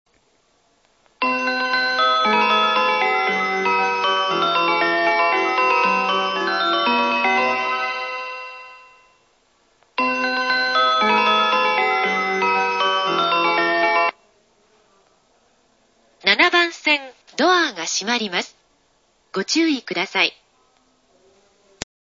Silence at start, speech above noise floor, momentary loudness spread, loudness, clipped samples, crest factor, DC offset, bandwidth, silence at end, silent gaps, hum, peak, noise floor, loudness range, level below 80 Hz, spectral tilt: 1.2 s; 41 dB; 8 LU; -18 LUFS; under 0.1%; 20 dB; under 0.1%; 8 kHz; 1.75 s; none; none; 0 dBFS; -62 dBFS; 6 LU; -66 dBFS; -2 dB/octave